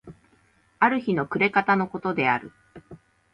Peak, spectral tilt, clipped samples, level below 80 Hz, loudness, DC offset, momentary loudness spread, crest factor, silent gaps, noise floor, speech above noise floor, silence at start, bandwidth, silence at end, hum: -6 dBFS; -8 dB/octave; under 0.1%; -64 dBFS; -23 LUFS; under 0.1%; 5 LU; 20 dB; none; -62 dBFS; 39 dB; 0.05 s; 6 kHz; 0.35 s; none